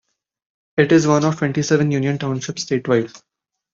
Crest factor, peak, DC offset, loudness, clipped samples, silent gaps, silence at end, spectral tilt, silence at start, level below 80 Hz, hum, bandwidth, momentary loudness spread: 18 dB; -2 dBFS; under 0.1%; -18 LUFS; under 0.1%; none; 0.55 s; -6 dB/octave; 0.75 s; -58 dBFS; none; 7.8 kHz; 10 LU